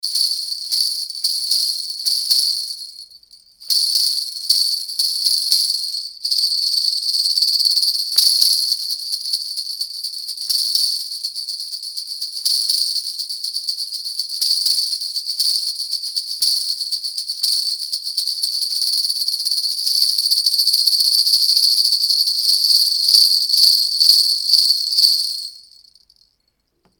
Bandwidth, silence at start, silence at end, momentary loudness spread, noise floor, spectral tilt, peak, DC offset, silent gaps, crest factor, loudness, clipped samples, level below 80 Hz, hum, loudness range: over 20 kHz; 0.05 s; 1.4 s; 11 LU; -68 dBFS; 6 dB/octave; 0 dBFS; under 0.1%; none; 18 dB; -15 LUFS; under 0.1%; -72 dBFS; none; 7 LU